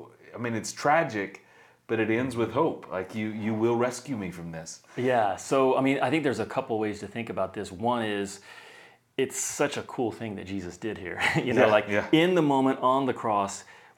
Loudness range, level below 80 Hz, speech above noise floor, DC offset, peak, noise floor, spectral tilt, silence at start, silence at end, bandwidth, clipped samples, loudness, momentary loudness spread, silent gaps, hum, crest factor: 7 LU; -66 dBFS; 26 dB; under 0.1%; -6 dBFS; -53 dBFS; -5 dB/octave; 0 s; 0.25 s; 18 kHz; under 0.1%; -27 LUFS; 14 LU; none; none; 22 dB